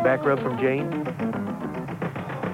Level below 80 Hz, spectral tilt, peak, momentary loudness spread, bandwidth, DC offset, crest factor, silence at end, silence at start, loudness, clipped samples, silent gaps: -58 dBFS; -8 dB/octave; -10 dBFS; 8 LU; 16 kHz; under 0.1%; 16 dB; 0 s; 0 s; -27 LUFS; under 0.1%; none